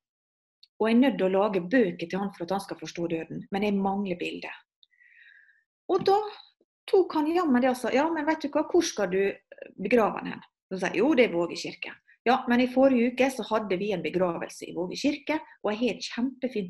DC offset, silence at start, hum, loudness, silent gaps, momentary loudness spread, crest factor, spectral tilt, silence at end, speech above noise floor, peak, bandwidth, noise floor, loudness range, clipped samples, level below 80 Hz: under 0.1%; 0.8 s; none; -27 LUFS; 4.76-4.82 s, 5.66-5.89 s, 6.64-6.87 s, 10.62-10.69 s, 12.19-12.25 s; 14 LU; 20 dB; -5.5 dB/octave; 0 s; 31 dB; -8 dBFS; 12.5 kHz; -57 dBFS; 6 LU; under 0.1%; -66 dBFS